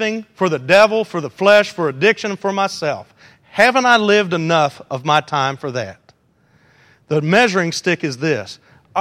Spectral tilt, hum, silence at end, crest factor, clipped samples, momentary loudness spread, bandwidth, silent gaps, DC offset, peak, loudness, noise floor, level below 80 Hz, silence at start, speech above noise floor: -4.5 dB/octave; none; 0 s; 18 dB; under 0.1%; 13 LU; 15 kHz; none; under 0.1%; 0 dBFS; -16 LUFS; -57 dBFS; -64 dBFS; 0 s; 40 dB